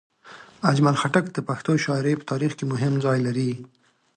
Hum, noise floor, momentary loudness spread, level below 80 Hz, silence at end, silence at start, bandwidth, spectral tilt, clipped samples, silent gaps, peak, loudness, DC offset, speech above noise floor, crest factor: none; -47 dBFS; 8 LU; -66 dBFS; 0.5 s; 0.25 s; 10 kHz; -6.5 dB/octave; under 0.1%; none; -4 dBFS; -23 LUFS; under 0.1%; 24 dB; 20 dB